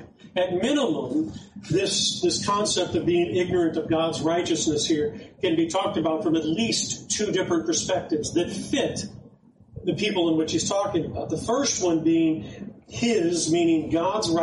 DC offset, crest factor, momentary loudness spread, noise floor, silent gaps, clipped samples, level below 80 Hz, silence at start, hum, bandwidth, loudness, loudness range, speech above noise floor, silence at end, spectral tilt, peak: under 0.1%; 12 dB; 7 LU; -52 dBFS; none; under 0.1%; -54 dBFS; 0 s; none; 11.5 kHz; -24 LUFS; 3 LU; 28 dB; 0 s; -4 dB/octave; -12 dBFS